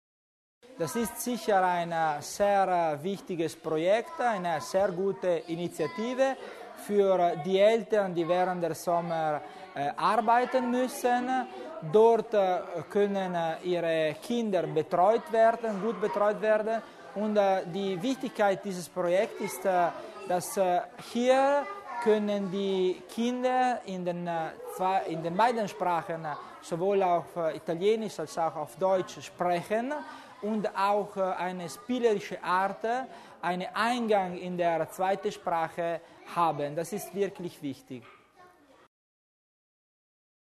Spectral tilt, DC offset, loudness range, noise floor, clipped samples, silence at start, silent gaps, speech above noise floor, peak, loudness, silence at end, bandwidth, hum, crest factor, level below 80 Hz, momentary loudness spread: -5 dB/octave; under 0.1%; 4 LU; -58 dBFS; under 0.1%; 0.7 s; none; 29 dB; -12 dBFS; -29 LUFS; 2 s; 13.5 kHz; none; 18 dB; -72 dBFS; 10 LU